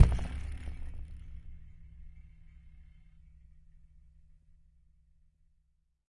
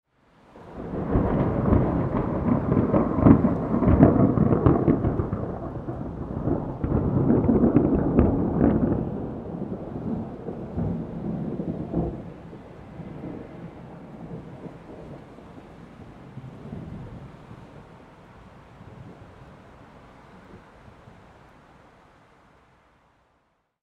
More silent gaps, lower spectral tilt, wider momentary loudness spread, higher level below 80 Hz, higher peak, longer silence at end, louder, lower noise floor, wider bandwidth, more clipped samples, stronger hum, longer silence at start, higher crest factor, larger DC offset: neither; second, -7.5 dB/octave vs -11.5 dB/octave; about the same, 22 LU vs 24 LU; about the same, -42 dBFS vs -38 dBFS; second, -4 dBFS vs 0 dBFS; about the same, 3.25 s vs 3.25 s; second, -38 LUFS vs -24 LUFS; first, -74 dBFS vs -69 dBFS; first, 11 kHz vs 4.6 kHz; neither; neither; second, 0 s vs 0.55 s; first, 30 dB vs 24 dB; neither